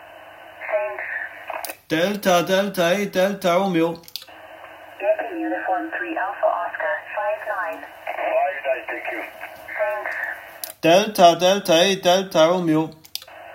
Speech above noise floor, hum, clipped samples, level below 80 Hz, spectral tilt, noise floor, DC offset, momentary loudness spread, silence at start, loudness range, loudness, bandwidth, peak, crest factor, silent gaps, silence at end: 24 dB; none; under 0.1%; -66 dBFS; -4 dB/octave; -42 dBFS; under 0.1%; 17 LU; 0 s; 8 LU; -21 LUFS; 16.5 kHz; 0 dBFS; 22 dB; none; 0 s